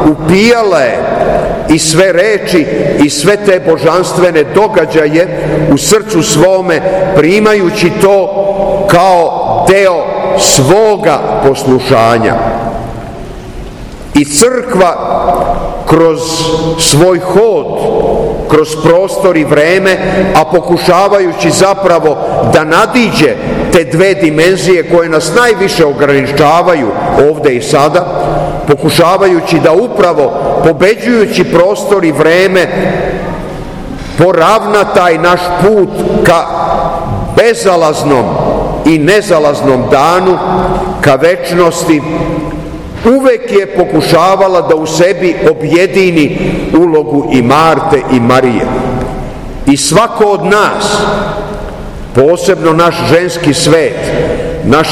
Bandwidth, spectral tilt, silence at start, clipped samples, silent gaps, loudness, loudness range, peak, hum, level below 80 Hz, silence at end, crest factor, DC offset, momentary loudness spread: over 20 kHz; -5 dB/octave; 0 s; 5%; none; -8 LUFS; 2 LU; 0 dBFS; none; -28 dBFS; 0 s; 8 dB; under 0.1%; 7 LU